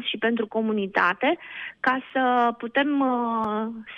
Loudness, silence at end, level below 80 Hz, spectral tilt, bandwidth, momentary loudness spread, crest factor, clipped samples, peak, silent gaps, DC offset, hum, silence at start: -24 LUFS; 0 s; -68 dBFS; -6.5 dB/octave; 6.8 kHz; 6 LU; 18 dB; under 0.1%; -6 dBFS; none; under 0.1%; none; 0 s